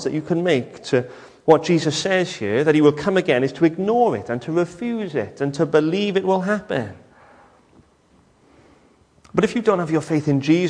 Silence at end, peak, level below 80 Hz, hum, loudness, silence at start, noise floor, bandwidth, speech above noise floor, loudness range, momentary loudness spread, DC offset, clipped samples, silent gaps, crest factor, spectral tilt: 0 s; -2 dBFS; -58 dBFS; none; -20 LUFS; 0 s; -56 dBFS; 10.5 kHz; 37 dB; 8 LU; 9 LU; under 0.1%; under 0.1%; none; 18 dB; -6 dB/octave